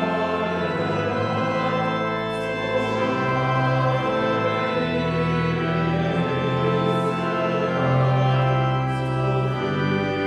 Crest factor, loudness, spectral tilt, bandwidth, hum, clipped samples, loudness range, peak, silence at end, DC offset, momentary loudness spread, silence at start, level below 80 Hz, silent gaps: 14 dB; -22 LUFS; -7.5 dB/octave; 9.4 kHz; none; under 0.1%; 1 LU; -8 dBFS; 0 s; under 0.1%; 4 LU; 0 s; -48 dBFS; none